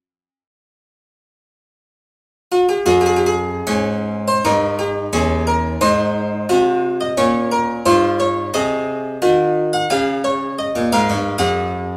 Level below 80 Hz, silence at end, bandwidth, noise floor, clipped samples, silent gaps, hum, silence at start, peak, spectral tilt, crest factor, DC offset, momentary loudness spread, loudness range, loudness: -38 dBFS; 0 s; 15.5 kHz; under -90 dBFS; under 0.1%; none; none; 2.5 s; -2 dBFS; -5 dB/octave; 16 dB; under 0.1%; 6 LU; 3 LU; -18 LUFS